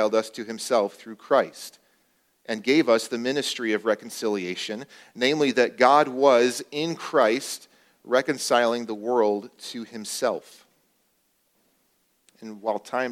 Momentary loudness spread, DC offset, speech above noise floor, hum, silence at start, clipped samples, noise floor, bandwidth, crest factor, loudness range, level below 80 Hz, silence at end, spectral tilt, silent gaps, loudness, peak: 16 LU; under 0.1%; 45 dB; none; 0 s; under 0.1%; -69 dBFS; 16 kHz; 22 dB; 8 LU; -78 dBFS; 0 s; -3.5 dB/octave; none; -24 LUFS; -4 dBFS